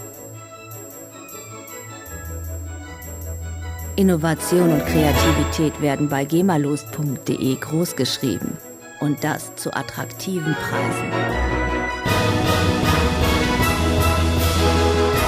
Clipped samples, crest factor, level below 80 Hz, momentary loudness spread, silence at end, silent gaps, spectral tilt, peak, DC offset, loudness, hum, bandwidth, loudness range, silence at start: under 0.1%; 18 dB; -32 dBFS; 17 LU; 0 s; none; -5 dB/octave; -4 dBFS; under 0.1%; -20 LUFS; none; 16 kHz; 8 LU; 0 s